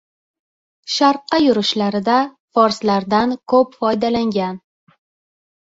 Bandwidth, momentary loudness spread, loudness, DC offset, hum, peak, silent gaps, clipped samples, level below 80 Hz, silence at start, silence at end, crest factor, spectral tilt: 8 kHz; 7 LU; -17 LUFS; under 0.1%; none; -2 dBFS; 2.39-2.48 s; under 0.1%; -56 dBFS; 0.85 s; 1.05 s; 16 dB; -5 dB/octave